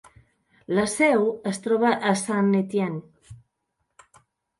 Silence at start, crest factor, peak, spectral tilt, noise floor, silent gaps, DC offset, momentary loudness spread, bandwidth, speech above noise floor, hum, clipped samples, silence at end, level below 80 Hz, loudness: 0.7 s; 18 dB; -6 dBFS; -5.5 dB/octave; -77 dBFS; none; under 0.1%; 8 LU; 11.5 kHz; 55 dB; none; under 0.1%; 1.25 s; -64 dBFS; -23 LUFS